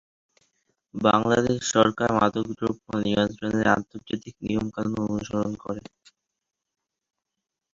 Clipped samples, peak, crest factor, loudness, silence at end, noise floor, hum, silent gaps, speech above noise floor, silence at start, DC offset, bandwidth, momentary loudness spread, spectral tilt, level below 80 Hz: under 0.1%; -4 dBFS; 24 dB; -25 LUFS; 1.95 s; -85 dBFS; none; none; 60 dB; 0.95 s; under 0.1%; 7.6 kHz; 13 LU; -5 dB/octave; -54 dBFS